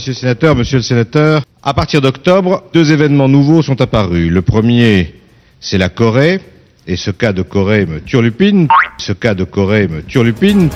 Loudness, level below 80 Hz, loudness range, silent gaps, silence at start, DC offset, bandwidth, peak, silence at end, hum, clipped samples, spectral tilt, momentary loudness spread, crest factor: -11 LUFS; -34 dBFS; 3 LU; none; 0 s; under 0.1%; 12 kHz; 0 dBFS; 0 s; none; 0.3%; -7 dB/octave; 7 LU; 12 dB